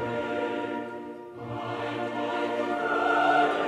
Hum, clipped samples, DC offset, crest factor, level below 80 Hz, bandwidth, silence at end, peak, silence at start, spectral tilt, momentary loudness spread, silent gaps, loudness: none; under 0.1%; under 0.1%; 16 dB; -66 dBFS; 12 kHz; 0 s; -12 dBFS; 0 s; -5.5 dB/octave; 15 LU; none; -28 LUFS